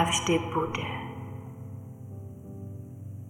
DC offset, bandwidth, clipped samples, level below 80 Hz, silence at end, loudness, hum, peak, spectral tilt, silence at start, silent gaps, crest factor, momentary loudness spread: under 0.1%; 17 kHz; under 0.1%; -56 dBFS; 0 s; -32 LUFS; none; -12 dBFS; -4 dB/octave; 0 s; none; 20 dB; 17 LU